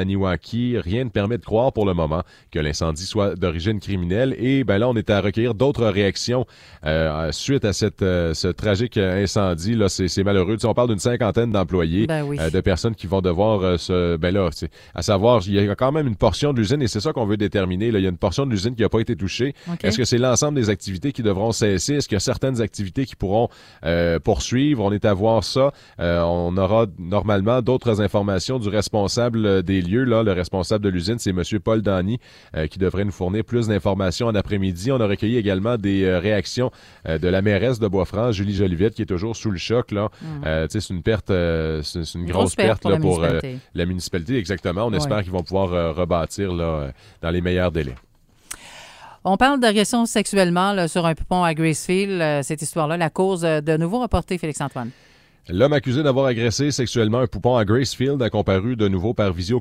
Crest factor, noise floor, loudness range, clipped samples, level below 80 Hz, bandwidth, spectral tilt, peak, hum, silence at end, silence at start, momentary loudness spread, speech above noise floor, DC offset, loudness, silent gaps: 18 dB; -42 dBFS; 3 LU; under 0.1%; -40 dBFS; 15.5 kHz; -5.5 dB/octave; -2 dBFS; none; 0 s; 0 s; 7 LU; 22 dB; under 0.1%; -21 LUFS; none